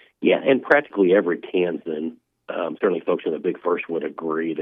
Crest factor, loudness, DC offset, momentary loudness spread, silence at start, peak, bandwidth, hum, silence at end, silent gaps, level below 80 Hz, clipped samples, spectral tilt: 20 dB; -22 LUFS; under 0.1%; 11 LU; 0.2 s; -2 dBFS; 5.2 kHz; none; 0 s; none; -74 dBFS; under 0.1%; -8 dB/octave